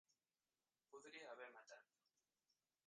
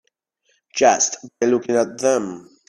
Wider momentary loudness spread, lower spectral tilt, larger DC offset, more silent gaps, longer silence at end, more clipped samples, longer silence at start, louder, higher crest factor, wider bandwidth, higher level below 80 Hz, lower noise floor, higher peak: about the same, 9 LU vs 9 LU; about the same, -1.5 dB/octave vs -2.5 dB/octave; neither; neither; first, 1.05 s vs 0.25 s; neither; second, 0.1 s vs 0.75 s; second, -61 LUFS vs -19 LUFS; about the same, 22 dB vs 20 dB; second, 9.4 kHz vs 12 kHz; second, under -90 dBFS vs -66 dBFS; first, under -90 dBFS vs -67 dBFS; second, -44 dBFS vs 0 dBFS